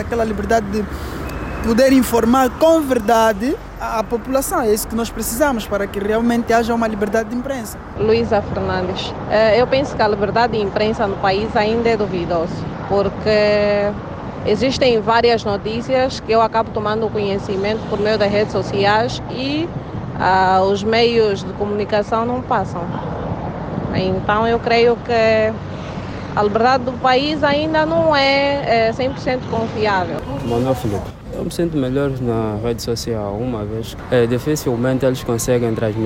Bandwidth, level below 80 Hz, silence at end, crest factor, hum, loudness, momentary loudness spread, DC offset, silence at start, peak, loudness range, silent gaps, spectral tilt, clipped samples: 16.5 kHz; -36 dBFS; 0 s; 14 dB; none; -18 LUFS; 10 LU; under 0.1%; 0 s; -4 dBFS; 4 LU; none; -5.5 dB/octave; under 0.1%